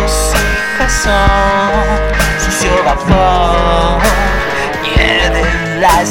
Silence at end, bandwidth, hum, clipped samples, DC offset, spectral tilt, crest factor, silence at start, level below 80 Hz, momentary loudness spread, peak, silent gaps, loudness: 0 s; 16.5 kHz; none; under 0.1%; under 0.1%; -4 dB/octave; 10 dB; 0 s; -16 dBFS; 4 LU; 0 dBFS; none; -11 LUFS